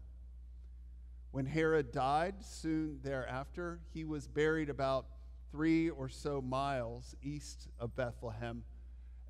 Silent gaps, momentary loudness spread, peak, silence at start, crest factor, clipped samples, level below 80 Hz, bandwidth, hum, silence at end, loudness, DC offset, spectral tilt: none; 21 LU; -22 dBFS; 0 s; 16 dB; under 0.1%; -52 dBFS; 12 kHz; none; 0 s; -38 LUFS; under 0.1%; -6.5 dB/octave